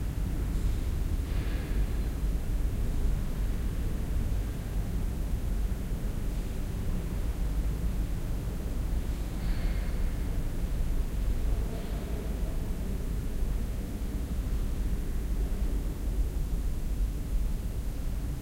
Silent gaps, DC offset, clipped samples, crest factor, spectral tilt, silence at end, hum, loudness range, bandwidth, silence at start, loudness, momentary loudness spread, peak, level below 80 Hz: none; under 0.1%; under 0.1%; 12 dB; -6.5 dB/octave; 0 s; none; 2 LU; 16 kHz; 0 s; -34 LUFS; 3 LU; -18 dBFS; -30 dBFS